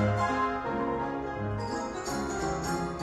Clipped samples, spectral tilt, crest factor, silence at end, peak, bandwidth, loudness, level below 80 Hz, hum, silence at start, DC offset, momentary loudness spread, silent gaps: under 0.1%; -5.5 dB/octave; 16 dB; 0 s; -16 dBFS; 13.5 kHz; -31 LUFS; -48 dBFS; none; 0 s; under 0.1%; 6 LU; none